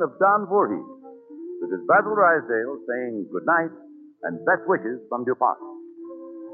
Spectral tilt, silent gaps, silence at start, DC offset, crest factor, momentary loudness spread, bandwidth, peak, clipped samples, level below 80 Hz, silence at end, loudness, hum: -8 dB/octave; none; 0 s; under 0.1%; 18 dB; 21 LU; 2.9 kHz; -6 dBFS; under 0.1%; -86 dBFS; 0 s; -23 LUFS; none